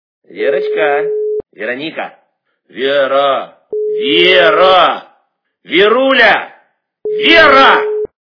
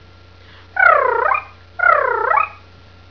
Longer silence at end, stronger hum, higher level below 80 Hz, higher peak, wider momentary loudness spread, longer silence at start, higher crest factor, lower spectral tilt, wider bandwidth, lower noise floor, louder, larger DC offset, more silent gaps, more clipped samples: second, 0.2 s vs 0.55 s; second, none vs 60 Hz at -55 dBFS; first, -48 dBFS vs -54 dBFS; about the same, 0 dBFS vs 0 dBFS; first, 15 LU vs 12 LU; second, 0.3 s vs 0.75 s; second, 12 dB vs 18 dB; about the same, -4.5 dB/octave vs -5.5 dB/octave; about the same, 5.4 kHz vs 5.4 kHz; first, -61 dBFS vs -44 dBFS; first, -10 LUFS vs -15 LUFS; second, under 0.1% vs 0.3%; neither; first, 0.6% vs under 0.1%